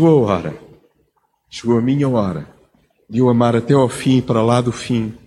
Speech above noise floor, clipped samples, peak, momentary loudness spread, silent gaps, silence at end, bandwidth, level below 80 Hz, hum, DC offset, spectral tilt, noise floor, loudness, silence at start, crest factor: 48 dB; under 0.1%; -2 dBFS; 13 LU; none; 0.1 s; 12 kHz; -50 dBFS; none; under 0.1%; -7.5 dB/octave; -63 dBFS; -16 LUFS; 0 s; 16 dB